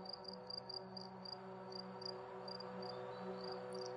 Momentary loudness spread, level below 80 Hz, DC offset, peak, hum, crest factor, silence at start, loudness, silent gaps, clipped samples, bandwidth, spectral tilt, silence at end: 3 LU; -84 dBFS; under 0.1%; -34 dBFS; none; 14 dB; 0 s; -49 LUFS; none; under 0.1%; 11 kHz; -5 dB/octave; 0 s